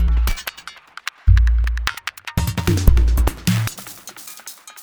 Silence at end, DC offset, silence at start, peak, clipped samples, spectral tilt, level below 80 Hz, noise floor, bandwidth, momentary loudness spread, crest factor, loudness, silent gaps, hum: 0 s; under 0.1%; 0 s; 0 dBFS; under 0.1%; -5 dB/octave; -20 dBFS; -39 dBFS; over 20 kHz; 18 LU; 18 dB; -20 LUFS; none; none